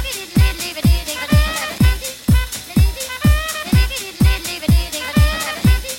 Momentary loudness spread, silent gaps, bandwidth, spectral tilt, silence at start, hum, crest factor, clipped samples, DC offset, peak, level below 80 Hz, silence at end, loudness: 4 LU; none; 17 kHz; -5 dB/octave; 0 s; none; 14 dB; under 0.1%; under 0.1%; -2 dBFS; -20 dBFS; 0 s; -17 LUFS